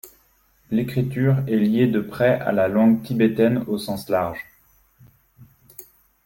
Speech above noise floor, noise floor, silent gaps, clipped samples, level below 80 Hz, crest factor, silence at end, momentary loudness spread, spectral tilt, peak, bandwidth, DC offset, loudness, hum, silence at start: 40 dB; -60 dBFS; none; under 0.1%; -54 dBFS; 16 dB; 0.45 s; 10 LU; -8 dB/octave; -6 dBFS; 17 kHz; under 0.1%; -21 LUFS; none; 0.05 s